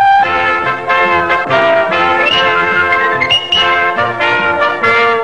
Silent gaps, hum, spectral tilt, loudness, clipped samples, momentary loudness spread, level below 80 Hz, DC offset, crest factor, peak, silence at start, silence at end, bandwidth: none; none; -3.5 dB/octave; -10 LUFS; under 0.1%; 3 LU; -48 dBFS; 0.8%; 12 dB; 0 dBFS; 0 s; 0 s; 10 kHz